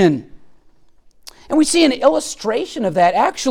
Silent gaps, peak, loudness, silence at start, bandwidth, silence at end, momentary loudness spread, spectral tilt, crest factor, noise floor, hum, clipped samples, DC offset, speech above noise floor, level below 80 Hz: none; 0 dBFS; -16 LUFS; 0 s; 16 kHz; 0 s; 8 LU; -4 dB/octave; 16 dB; -48 dBFS; none; under 0.1%; under 0.1%; 33 dB; -50 dBFS